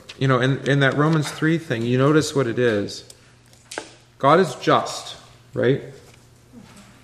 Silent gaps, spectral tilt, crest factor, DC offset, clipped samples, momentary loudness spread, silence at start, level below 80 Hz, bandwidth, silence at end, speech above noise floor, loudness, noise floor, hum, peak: none; -6 dB/octave; 20 dB; under 0.1%; under 0.1%; 17 LU; 0.1 s; -60 dBFS; 13.5 kHz; 0.2 s; 32 dB; -20 LUFS; -51 dBFS; none; -2 dBFS